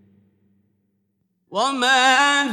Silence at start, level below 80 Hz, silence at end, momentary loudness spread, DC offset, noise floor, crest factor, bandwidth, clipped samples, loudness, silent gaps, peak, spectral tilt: 1.5 s; -80 dBFS; 0 s; 10 LU; under 0.1%; -70 dBFS; 20 dB; 14.5 kHz; under 0.1%; -16 LUFS; none; -2 dBFS; -0.5 dB/octave